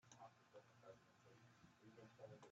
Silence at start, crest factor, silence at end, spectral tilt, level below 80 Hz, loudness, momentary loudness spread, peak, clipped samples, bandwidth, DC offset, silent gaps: 0 s; 18 dB; 0 s; -5 dB/octave; under -90 dBFS; -66 LUFS; 6 LU; -48 dBFS; under 0.1%; 7.6 kHz; under 0.1%; none